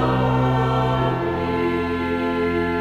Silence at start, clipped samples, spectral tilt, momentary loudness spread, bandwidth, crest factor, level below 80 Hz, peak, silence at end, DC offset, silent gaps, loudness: 0 s; under 0.1%; -8 dB/octave; 4 LU; 7.2 kHz; 12 dB; -38 dBFS; -8 dBFS; 0 s; under 0.1%; none; -21 LUFS